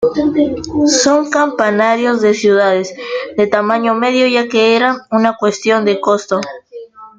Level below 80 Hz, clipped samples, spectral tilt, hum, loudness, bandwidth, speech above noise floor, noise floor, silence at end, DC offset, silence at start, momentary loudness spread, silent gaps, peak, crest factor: -52 dBFS; under 0.1%; -3.5 dB/octave; none; -13 LUFS; 9.4 kHz; 21 dB; -33 dBFS; 0.1 s; under 0.1%; 0 s; 8 LU; none; 0 dBFS; 14 dB